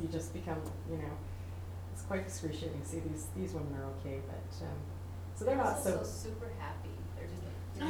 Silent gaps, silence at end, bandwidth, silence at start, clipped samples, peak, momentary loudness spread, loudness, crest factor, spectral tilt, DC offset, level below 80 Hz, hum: none; 0 s; 20 kHz; 0 s; under 0.1%; -18 dBFS; 10 LU; -40 LUFS; 20 dB; -6 dB/octave; under 0.1%; -52 dBFS; none